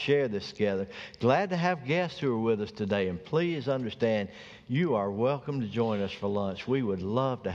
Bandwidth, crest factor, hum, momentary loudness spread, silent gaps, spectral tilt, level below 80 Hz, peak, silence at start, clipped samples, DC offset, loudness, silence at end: 7.6 kHz; 18 dB; none; 5 LU; none; -7.5 dB/octave; -64 dBFS; -10 dBFS; 0 s; under 0.1%; under 0.1%; -30 LUFS; 0 s